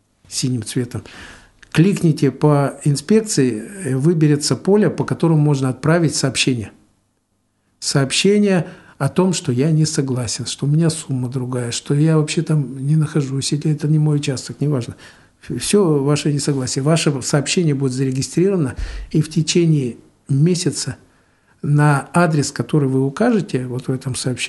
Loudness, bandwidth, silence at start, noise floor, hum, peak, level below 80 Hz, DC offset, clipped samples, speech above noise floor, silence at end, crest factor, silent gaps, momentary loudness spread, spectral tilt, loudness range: -18 LUFS; 12 kHz; 0.3 s; -66 dBFS; none; 0 dBFS; -44 dBFS; under 0.1%; under 0.1%; 49 dB; 0 s; 18 dB; none; 9 LU; -5.5 dB/octave; 2 LU